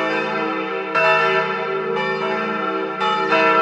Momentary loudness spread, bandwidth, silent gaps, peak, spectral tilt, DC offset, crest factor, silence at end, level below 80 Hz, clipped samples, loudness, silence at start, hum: 7 LU; 9.4 kHz; none; -4 dBFS; -5 dB/octave; under 0.1%; 16 dB; 0 s; -72 dBFS; under 0.1%; -19 LUFS; 0 s; none